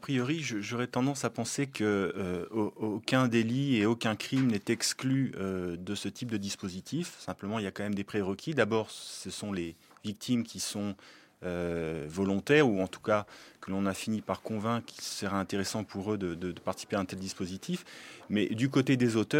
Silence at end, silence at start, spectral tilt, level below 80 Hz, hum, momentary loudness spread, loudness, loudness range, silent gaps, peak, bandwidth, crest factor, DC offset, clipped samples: 0 s; 0 s; -5 dB/octave; -70 dBFS; none; 11 LU; -32 LUFS; 5 LU; none; -10 dBFS; 16.5 kHz; 22 dB; under 0.1%; under 0.1%